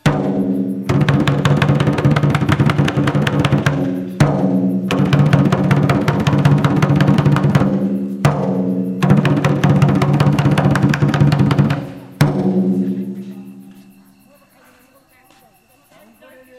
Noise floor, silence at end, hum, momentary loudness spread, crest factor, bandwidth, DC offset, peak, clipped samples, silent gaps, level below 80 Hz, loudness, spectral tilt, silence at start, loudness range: -52 dBFS; 2.85 s; none; 6 LU; 16 dB; 13.5 kHz; under 0.1%; 0 dBFS; under 0.1%; none; -42 dBFS; -15 LUFS; -7.5 dB/octave; 0.05 s; 7 LU